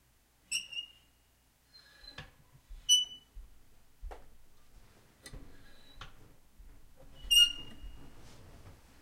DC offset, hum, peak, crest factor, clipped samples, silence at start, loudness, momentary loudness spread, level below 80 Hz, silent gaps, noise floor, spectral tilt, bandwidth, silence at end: under 0.1%; none; -14 dBFS; 24 dB; under 0.1%; 0.5 s; -28 LUFS; 30 LU; -54 dBFS; none; -68 dBFS; 1.5 dB/octave; 16 kHz; 0.3 s